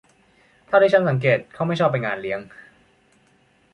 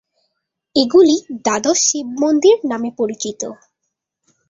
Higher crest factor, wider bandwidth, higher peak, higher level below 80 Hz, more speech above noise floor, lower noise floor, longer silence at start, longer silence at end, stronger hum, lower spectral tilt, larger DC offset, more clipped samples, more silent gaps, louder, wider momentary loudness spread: about the same, 20 dB vs 16 dB; first, 10 kHz vs 7.8 kHz; about the same, -4 dBFS vs -2 dBFS; about the same, -62 dBFS vs -60 dBFS; second, 40 dB vs 61 dB; second, -60 dBFS vs -77 dBFS; about the same, 0.7 s vs 0.75 s; first, 1.3 s vs 0.95 s; neither; first, -7.5 dB/octave vs -2.5 dB/octave; neither; neither; neither; second, -20 LUFS vs -16 LUFS; about the same, 12 LU vs 12 LU